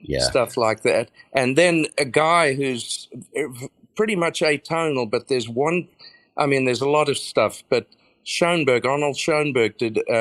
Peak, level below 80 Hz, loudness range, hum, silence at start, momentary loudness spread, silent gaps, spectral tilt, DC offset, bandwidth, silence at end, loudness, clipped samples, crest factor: -2 dBFS; -52 dBFS; 3 LU; none; 0.05 s; 11 LU; none; -4 dB/octave; under 0.1%; 14 kHz; 0 s; -21 LUFS; under 0.1%; 20 dB